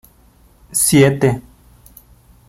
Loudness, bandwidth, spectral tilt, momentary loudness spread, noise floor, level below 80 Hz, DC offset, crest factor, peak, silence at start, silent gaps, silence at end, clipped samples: -14 LUFS; 16.5 kHz; -4.5 dB/octave; 11 LU; -50 dBFS; -46 dBFS; under 0.1%; 18 dB; -2 dBFS; 0.7 s; none; 1.1 s; under 0.1%